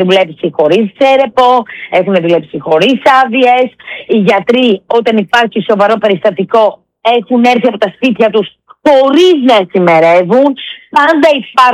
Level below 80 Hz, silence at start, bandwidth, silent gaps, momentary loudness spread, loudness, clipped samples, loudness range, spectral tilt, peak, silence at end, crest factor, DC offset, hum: -54 dBFS; 0 s; 12.5 kHz; none; 7 LU; -9 LUFS; 0.2%; 2 LU; -5.5 dB/octave; 0 dBFS; 0 s; 8 dB; under 0.1%; none